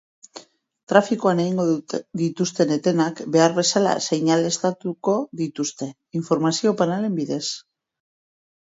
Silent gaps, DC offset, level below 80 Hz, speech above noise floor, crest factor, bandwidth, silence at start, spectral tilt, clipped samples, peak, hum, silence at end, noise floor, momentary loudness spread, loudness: 0.83-0.87 s; under 0.1%; -70 dBFS; 24 dB; 22 dB; 8 kHz; 0.35 s; -5 dB/octave; under 0.1%; 0 dBFS; none; 1.05 s; -45 dBFS; 9 LU; -22 LUFS